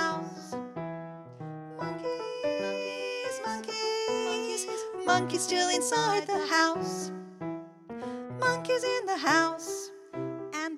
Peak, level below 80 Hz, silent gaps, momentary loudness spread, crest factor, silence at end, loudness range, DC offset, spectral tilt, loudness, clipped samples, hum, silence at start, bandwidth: -10 dBFS; -74 dBFS; none; 14 LU; 20 dB; 0 s; 7 LU; under 0.1%; -3 dB/octave; -30 LUFS; under 0.1%; none; 0 s; 15.5 kHz